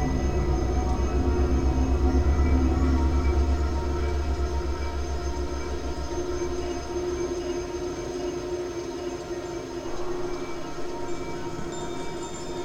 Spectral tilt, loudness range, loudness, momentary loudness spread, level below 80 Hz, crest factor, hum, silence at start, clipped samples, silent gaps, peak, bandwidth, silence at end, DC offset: -6.5 dB/octave; 9 LU; -28 LUFS; 10 LU; -28 dBFS; 16 dB; none; 0 s; under 0.1%; none; -10 dBFS; 9 kHz; 0 s; under 0.1%